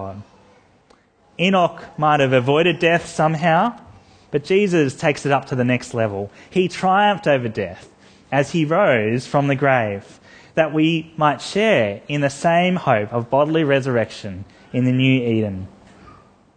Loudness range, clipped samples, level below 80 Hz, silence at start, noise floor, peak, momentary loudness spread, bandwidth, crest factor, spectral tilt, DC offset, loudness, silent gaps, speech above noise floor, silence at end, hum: 2 LU; under 0.1%; -58 dBFS; 0 s; -55 dBFS; -2 dBFS; 10 LU; 9.8 kHz; 18 dB; -6 dB/octave; under 0.1%; -19 LUFS; none; 37 dB; 0.9 s; none